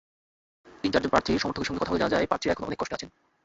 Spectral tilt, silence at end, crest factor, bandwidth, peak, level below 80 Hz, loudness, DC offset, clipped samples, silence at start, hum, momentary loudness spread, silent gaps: -5 dB/octave; 0.35 s; 22 dB; 8 kHz; -6 dBFS; -50 dBFS; -27 LUFS; under 0.1%; under 0.1%; 0.65 s; none; 9 LU; none